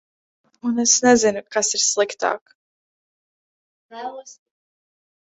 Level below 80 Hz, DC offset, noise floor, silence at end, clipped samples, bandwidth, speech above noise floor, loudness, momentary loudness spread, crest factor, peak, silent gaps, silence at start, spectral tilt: -64 dBFS; under 0.1%; under -90 dBFS; 0.9 s; under 0.1%; 8.4 kHz; over 70 dB; -18 LUFS; 19 LU; 22 dB; -2 dBFS; 2.41-2.46 s, 2.55-3.89 s; 0.65 s; -1.5 dB/octave